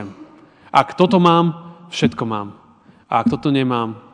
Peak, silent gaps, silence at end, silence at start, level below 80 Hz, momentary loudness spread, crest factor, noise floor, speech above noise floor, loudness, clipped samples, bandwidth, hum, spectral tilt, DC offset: 0 dBFS; none; 0.15 s; 0 s; -56 dBFS; 15 LU; 18 dB; -49 dBFS; 33 dB; -18 LUFS; under 0.1%; 10.5 kHz; none; -6.5 dB/octave; under 0.1%